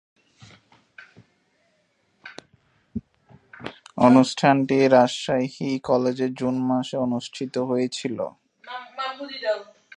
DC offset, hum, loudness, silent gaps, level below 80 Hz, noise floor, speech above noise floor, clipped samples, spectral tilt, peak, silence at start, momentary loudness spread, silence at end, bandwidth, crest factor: under 0.1%; none; -22 LUFS; none; -62 dBFS; -67 dBFS; 46 dB; under 0.1%; -6 dB/octave; -2 dBFS; 2.25 s; 21 LU; 0.35 s; 10 kHz; 22 dB